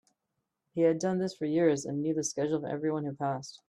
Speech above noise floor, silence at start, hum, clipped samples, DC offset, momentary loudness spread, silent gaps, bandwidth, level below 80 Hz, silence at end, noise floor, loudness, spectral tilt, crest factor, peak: 54 dB; 0.75 s; none; under 0.1%; under 0.1%; 7 LU; none; 11.5 kHz; -74 dBFS; 0.15 s; -84 dBFS; -30 LUFS; -5.5 dB/octave; 18 dB; -14 dBFS